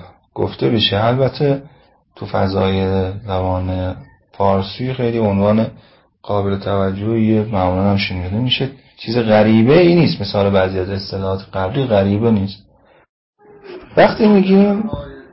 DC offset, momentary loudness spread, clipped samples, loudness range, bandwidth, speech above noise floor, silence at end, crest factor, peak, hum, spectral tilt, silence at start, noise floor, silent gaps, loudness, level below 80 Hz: under 0.1%; 12 LU; under 0.1%; 5 LU; 5.8 kHz; 21 dB; 0.1 s; 16 dB; 0 dBFS; none; -11 dB/octave; 0 s; -36 dBFS; 13.09-13.33 s; -16 LUFS; -36 dBFS